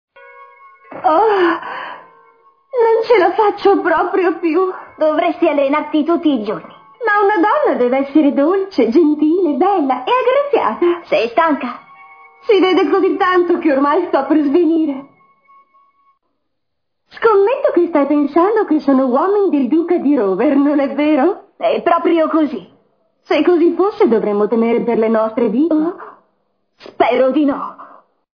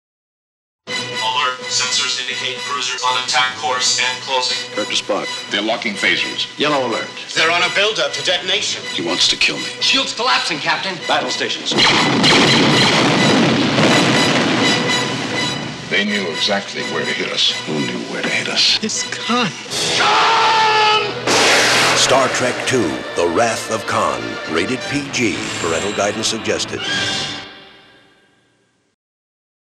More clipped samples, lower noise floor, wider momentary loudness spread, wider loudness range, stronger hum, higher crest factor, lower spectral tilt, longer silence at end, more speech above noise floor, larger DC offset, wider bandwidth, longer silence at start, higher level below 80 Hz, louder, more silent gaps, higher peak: neither; first, -76 dBFS vs -60 dBFS; about the same, 7 LU vs 9 LU; second, 3 LU vs 6 LU; neither; about the same, 14 dB vs 16 dB; first, -7 dB/octave vs -2.5 dB/octave; second, 0.5 s vs 2 s; first, 63 dB vs 43 dB; neither; second, 5.4 kHz vs 15.5 kHz; second, 0.4 s vs 0.85 s; second, -62 dBFS vs -54 dBFS; about the same, -14 LUFS vs -15 LUFS; neither; about the same, 0 dBFS vs -2 dBFS